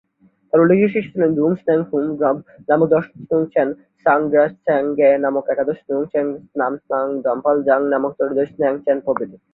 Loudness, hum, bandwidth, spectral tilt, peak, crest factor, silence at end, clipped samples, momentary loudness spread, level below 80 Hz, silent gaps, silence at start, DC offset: -18 LUFS; none; 4.1 kHz; -11 dB/octave; -2 dBFS; 16 dB; 0.2 s; under 0.1%; 7 LU; -62 dBFS; none; 0.55 s; under 0.1%